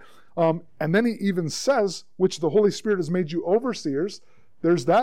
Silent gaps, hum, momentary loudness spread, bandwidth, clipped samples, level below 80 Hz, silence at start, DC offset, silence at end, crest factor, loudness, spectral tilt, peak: none; none; 7 LU; 15 kHz; under 0.1%; -68 dBFS; 0.35 s; 0.6%; 0 s; 14 dB; -24 LUFS; -6 dB/octave; -8 dBFS